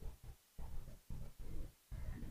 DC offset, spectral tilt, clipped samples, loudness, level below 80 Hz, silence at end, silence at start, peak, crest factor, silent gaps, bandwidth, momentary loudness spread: under 0.1%; -6.5 dB/octave; under 0.1%; -55 LUFS; -50 dBFS; 0 s; 0 s; -34 dBFS; 12 dB; none; 15.5 kHz; 6 LU